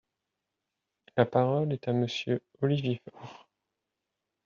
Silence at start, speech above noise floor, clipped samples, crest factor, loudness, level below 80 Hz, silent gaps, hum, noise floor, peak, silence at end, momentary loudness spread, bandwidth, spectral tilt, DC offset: 1.15 s; 57 dB; under 0.1%; 24 dB; -30 LUFS; -70 dBFS; none; none; -86 dBFS; -8 dBFS; 1.1 s; 18 LU; 7.2 kHz; -6 dB/octave; under 0.1%